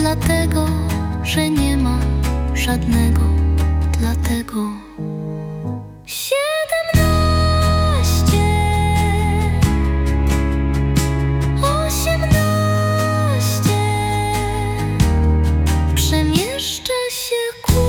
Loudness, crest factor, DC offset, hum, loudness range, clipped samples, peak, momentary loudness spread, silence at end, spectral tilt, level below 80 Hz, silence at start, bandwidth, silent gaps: -18 LUFS; 14 dB; under 0.1%; none; 4 LU; under 0.1%; -2 dBFS; 6 LU; 0 s; -5.5 dB/octave; -24 dBFS; 0 s; 18 kHz; none